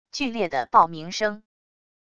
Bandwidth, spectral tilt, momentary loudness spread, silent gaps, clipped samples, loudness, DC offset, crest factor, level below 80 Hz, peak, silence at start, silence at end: 9.8 kHz; -4 dB/octave; 9 LU; none; under 0.1%; -23 LUFS; under 0.1%; 22 dB; -60 dBFS; -4 dBFS; 0.15 s; 0.75 s